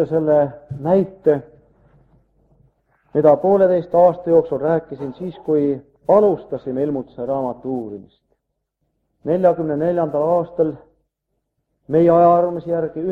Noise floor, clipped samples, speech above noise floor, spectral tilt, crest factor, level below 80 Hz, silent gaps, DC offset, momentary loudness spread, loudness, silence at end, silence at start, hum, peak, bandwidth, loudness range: -75 dBFS; under 0.1%; 58 dB; -10.5 dB/octave; 18 dB; -56 dBFS; none; under 0.1%; 12 LU; -18 LUFS; 0 s; 0 s; none; 0 dBFS; 4.4 kHz; 5 LU